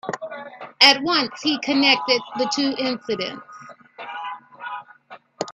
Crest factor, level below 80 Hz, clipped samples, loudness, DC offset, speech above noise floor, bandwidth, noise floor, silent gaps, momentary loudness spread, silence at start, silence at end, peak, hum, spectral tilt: 24 dB; -70 dBFS; under 0.1%; -19 LUFS; under 0.1%; 26 dB; 13.5 kHz; -46 dBFS; none; 22 LU; 0.05 s; 0 s; 0 dBFS; none; -2.5 dB/octave